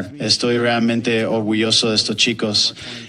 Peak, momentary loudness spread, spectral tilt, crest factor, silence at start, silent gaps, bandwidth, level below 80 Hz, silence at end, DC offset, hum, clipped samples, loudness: -2 dBFS; 4 LU; -3.5 dB/octave; 18 dB; 0 s; none; 11 kHz; -58 dBFS; 0 s; under 0.1%; none; under 0.1%; -17 LUFS